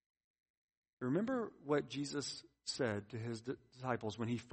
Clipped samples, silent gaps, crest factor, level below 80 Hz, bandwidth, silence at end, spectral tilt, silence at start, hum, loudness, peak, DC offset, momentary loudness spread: under 0.1%; none; 20 dB; -76 dBFS; 8.4 kHz; 0 s; -5 dB/octave; 1 s; none; -41 LUFS; -22 dBFS; under 0.1%; 8 LU